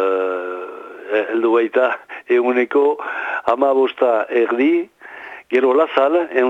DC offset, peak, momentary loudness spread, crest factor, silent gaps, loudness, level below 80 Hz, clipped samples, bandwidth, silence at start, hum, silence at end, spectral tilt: under 0.1%; -2 dBFS; 14 LU; 16 dB; none; -17 LUFS; -68 dBFS; under 0.1%; 5.8 kHz; 0 s; none; 0 s; -5.5 dB/octave